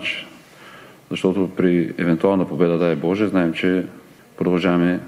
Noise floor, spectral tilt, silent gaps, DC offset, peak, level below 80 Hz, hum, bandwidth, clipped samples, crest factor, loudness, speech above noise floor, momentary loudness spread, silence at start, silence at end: -43 dBFS; -7.5 dB/octave; none; under 0.1%; -2 dBFS; -58 dBFS; none; 12 kHz; under 0.1%; 18 dB; -20 LUFS; 25 dB; 8 LU; 0 s; 0 s